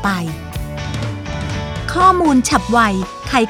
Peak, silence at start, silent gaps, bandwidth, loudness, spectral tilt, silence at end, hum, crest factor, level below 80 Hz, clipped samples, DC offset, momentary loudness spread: 0 dBFS; 0 s; none; 18.5 kHz; -17 LUFS; -5 dB/octave; 0 s; none; 16 dB; -32 dBFS; under 0.1%; under 0.1%; 13 LU